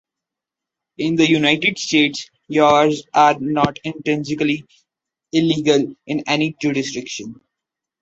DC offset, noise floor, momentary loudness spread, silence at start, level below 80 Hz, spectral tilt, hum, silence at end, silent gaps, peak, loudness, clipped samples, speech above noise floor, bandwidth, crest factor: under 0.1%; -85 dBFS; 11 LU; 1 s; -58 dBFS; -4.5 dB/octave; none; 0.65 s; none; -2 dBFS; -18 LUFS; under 0.1%; 68 dB; 8 kHz; 18 dB